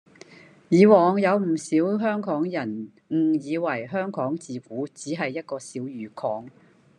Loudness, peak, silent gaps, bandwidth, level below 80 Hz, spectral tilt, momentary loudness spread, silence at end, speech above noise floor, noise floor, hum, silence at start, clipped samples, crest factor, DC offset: -24 LUFS; -4 dBFS; none; 10 kHz; -76 dBFS; -7 dB/octave; 16 LU; 0.5 s; 26 dB; -49 dBFS; none; 0.7 s; under 0.1%; 20 dB; under 0.1%